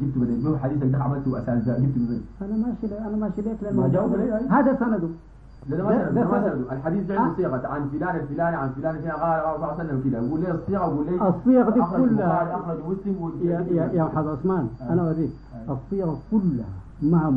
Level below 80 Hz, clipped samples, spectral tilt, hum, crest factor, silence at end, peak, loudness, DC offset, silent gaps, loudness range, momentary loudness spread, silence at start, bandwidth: -46 dBFS; under 0.1%; -11.5 dB/octave; none; 16 dB; 0 s; -8 dBFS; -24 LUFS; 0.1%; none; 3 LU; 8 LU; 0 s; 5 kHz